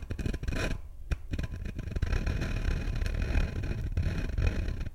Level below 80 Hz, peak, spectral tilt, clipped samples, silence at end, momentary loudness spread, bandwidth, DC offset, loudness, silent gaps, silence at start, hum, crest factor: -32 dBFS; -14 dBFS; -6.5 dB/octave; under 0.1%; 0 s; 6 LU; 13 kHz; under 0.1%; -34 LUFS; none; 0 s; none; 18 dB